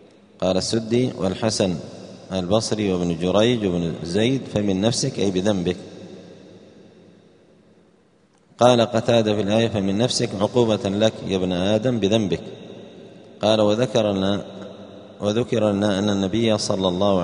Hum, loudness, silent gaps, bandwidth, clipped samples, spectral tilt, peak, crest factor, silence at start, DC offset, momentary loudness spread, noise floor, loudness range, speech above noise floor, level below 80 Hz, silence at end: none; -21 LUFS; none; 10.5 kHz; under 0.1%; -5.5 dB/octave; 0 dBFS; 22 dB; 0.4 s; under 0.1%; 17 LU; -58 dBFS; 5 LU; 38 dB; -54 dBFS; 0 s